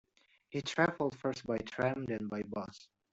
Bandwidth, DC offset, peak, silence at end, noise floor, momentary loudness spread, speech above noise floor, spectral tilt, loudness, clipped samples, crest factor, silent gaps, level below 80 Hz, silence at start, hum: 8.2 kHz; under 0.1%; -14 dBFS; 0.3 s; -67 dBFS; 11 LU; 31 dB; -5.5 dB/octave; -36 LUFS; under 0.1%; 22 dB; none; -70 dBFS; 0.5 s; none